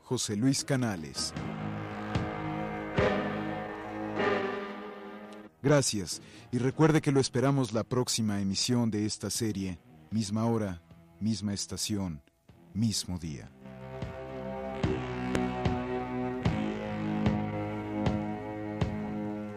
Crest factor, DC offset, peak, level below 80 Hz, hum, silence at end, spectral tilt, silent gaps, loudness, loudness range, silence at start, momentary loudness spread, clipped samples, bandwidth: 22 dB; under 0.1%; -8 dBFS; -52 dBFS; none; 0 s; -5 dB/octave; none; -31 LUFS; 6 LU; 0.05 s; 13 LU; under 0.1%; 15.5 kHz